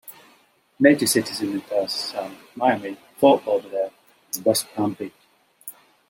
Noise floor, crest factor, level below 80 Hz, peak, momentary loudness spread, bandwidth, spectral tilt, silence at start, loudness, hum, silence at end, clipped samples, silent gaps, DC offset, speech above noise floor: -59 dBFS; 22 dB; -70 dBFS; -2 dBFS; 19 LU; 17 kHz; -3.5 dB/octave; 0.1 s; -22 LUFS; none; 0.4 s; under 0.1%; none; under 0.1%; 37 dB